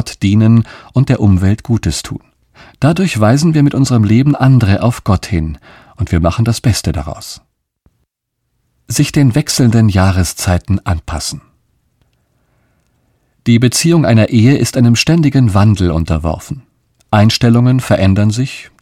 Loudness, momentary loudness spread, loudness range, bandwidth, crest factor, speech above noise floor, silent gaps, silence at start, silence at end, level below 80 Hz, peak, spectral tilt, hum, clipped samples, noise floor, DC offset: -12 LUFS; 12 LU; 7 LU; 15.5 kHz; 12 dB; 59 dB; none; 0 s; 0.15 s; -32 dBFS; 0 dBFS; -6 dB/octave; none; under 0.1%; -70 dBFS; under 0.1%